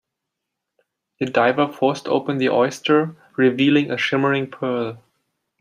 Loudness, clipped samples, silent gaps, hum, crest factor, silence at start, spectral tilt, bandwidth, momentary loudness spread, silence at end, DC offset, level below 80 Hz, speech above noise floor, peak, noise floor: -20 LUFS; under 0.1%; none; none; 18 dB; 1.2 s; -6 dB/octave; 12 kHz; 8 LU; 0.65 s; under 0.1%; -68 dBFS; 62 dB; -2 dBFS; -81 dBFS